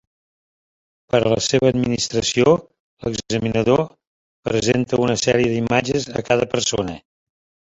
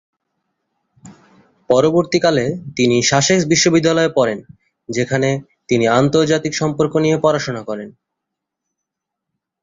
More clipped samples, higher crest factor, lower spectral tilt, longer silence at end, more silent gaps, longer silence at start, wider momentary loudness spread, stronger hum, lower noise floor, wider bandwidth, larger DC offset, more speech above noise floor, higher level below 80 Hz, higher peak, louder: neither; about the same, 18 dB vs 16 dB; about the same, -4.5 dB/octave vs -4.5 dB/octave; second, 0.75 s vs 1.7 s; first, 2.80-2.97 s, 4.07-4.43 s vs none; about the same, 1.15 s vs 1.05 s; about the same, 10 LU vs 12 LU; neither; first, under -90 dBFS vs -80 dBFS; about the same, 8.2 kHz vs 7.8 kHz; neither; first, over 71 dB vs 65 dB; first, -48 dBFS vs -54 dBFS; about the same, -2 dBFS vs -2 dBFS; second, -19 LUFS vs -16 LUFS